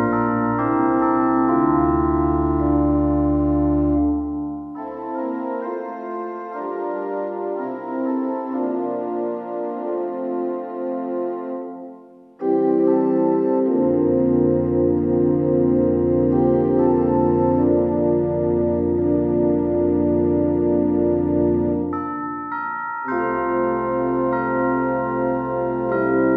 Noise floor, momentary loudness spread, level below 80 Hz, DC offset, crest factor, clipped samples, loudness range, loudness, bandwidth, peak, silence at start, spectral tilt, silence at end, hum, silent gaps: -44 dBFS; 9 LU; -40 dBFS; under 0.1%; 14 dB; under 0.1%; 8 LU; -20 LUFS; 3 kHz; -6 dBFS; 0 s; -12 dB/octave; 0 s; none; none